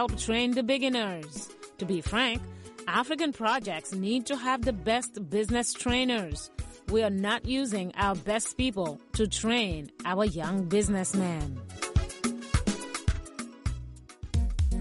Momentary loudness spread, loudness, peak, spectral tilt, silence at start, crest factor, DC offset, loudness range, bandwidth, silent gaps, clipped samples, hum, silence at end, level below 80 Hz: 11 LU; -29 LUFS; -14 dBFS; -4.5 dB/octave; 0 s; 16 dB; under 0.1%; 2 LU; 11.5 kHz; none; under 0.1%; none; 0 s; -38 dBFS